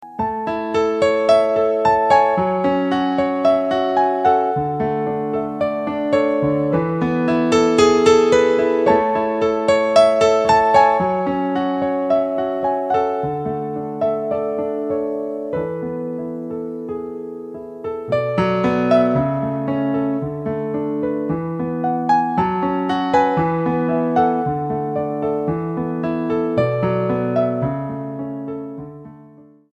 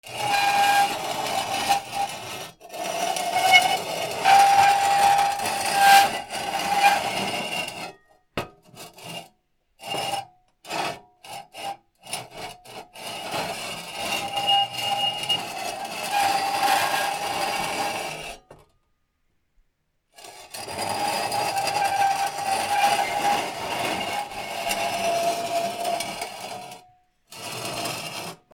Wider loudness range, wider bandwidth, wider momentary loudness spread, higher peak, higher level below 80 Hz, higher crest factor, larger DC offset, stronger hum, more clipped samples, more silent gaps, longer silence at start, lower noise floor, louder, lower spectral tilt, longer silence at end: second, 8 LU vs 14 LU; second, 9.8 kHz vs 18.5 kHz; second, 12 LU vs 20 LU; about the same, 0 dBFS vs -2 dBFS; first, -50 dBFS vs -62 dBFS; second, 18 dB vs 24 dB; neither; neither; neither; neither; about the same, 0 s vs 0.05 s; second, -46 dBFS vs -71 dBFS; first, -18 LUFS vs -23 LUFS; first, -6.5 dB/octave vs -1.5 dB/octave; first, 0.45 s vs 0.2 s